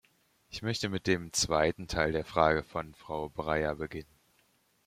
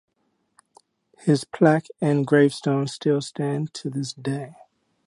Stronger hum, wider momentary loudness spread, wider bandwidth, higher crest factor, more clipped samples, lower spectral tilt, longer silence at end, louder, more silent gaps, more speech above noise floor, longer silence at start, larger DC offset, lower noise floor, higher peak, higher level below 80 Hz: neither; about the same, 12 LU vs 11 LU; first, 16 kHz vs 11.5 kHz; about the same, 24 dB vs 20 dB; neither; second, -4 dB/octave vs -6.5 dB/octave; first, 0.85 s vs 0.55 s; second, -31 LUFS vs -23 LUFS; neither; second, 39 dB vs 49 dB; second, 0.5 s vs 1.25 s; neither; about the same, -70 dBFS vs -71 dBFS; second, -10 dBFS vs -4 dBFS; first, -52 dBFS vs -72 dBFS